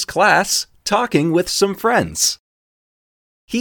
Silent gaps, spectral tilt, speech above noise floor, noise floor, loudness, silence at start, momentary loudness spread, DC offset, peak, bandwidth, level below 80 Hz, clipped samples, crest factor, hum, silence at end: 2.40-3.48 s; -3 dB/octave; over 74 dB; under -90 dBFS; -17 LUFS; 0 s; 6 LU; under 0.1%; 0 dBFS; 19 kHz; -50 dBFS; under 0.1%; 18 dB; none; 0 s